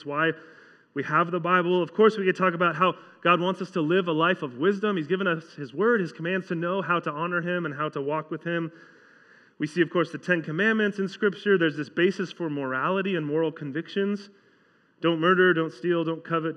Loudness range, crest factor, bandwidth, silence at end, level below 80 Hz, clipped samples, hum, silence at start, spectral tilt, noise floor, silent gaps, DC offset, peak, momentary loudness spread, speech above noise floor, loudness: 5 LU; 20 dB; 9.4 kHz; 0 s; under -90 dBFS; under 0.1%; none; 0 s; -7 dB/octave; -62 dBFS; none; under 0.1%; -6 dBFS; 9 LU; 37 dB; -25 LUFS